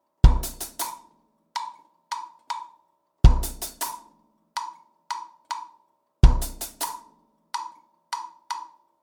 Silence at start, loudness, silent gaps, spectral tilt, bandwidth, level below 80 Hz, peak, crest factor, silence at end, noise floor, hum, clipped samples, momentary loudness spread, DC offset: 0.25 s; -28 LUFS; none; -5 dB/octave; over 20 kHz; -26 dBFS; -2 dBFS; 24 dB; 0.35 s; -65 dBFS; none; under 0.1%; 19 LU; under 0.1%